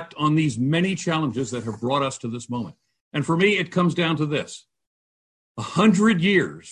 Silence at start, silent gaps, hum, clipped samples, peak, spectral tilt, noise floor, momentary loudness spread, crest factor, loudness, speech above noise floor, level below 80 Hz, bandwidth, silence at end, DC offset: 0 s; 3.01-3.11 s, 4.87-5.55 s; none; under 0.1%; -4 dBFS; -5.5 dB/octave; under -90 dBFS; 13 LU; 18 dB; -22 LUFS; over 68 dB; -60 dBFS; 10.5 kHz; 0 s; under 0.1%